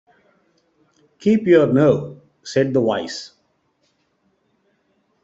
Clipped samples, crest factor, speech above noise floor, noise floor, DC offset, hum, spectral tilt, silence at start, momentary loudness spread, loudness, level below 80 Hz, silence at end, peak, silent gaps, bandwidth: under 0.1%; 20 dB; 50 dB; -66 dBFS; under 0.1%; none; -7 dB/octave; 1.2 s; 20 LU; -18 LUFS; -60 dBFS; 1.95 s; -2 dBFS; none; 8 kHz